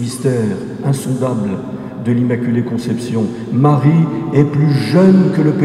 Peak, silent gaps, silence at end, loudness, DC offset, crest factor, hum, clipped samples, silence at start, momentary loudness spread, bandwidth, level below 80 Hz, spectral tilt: 0 dBFS; none; 0 s; -15 LUFS; under 0.1%; 14 dB; none; under 0.1%; 0 s; 10 LU; 13 kHz; -52 dBFS; -8 dB/octave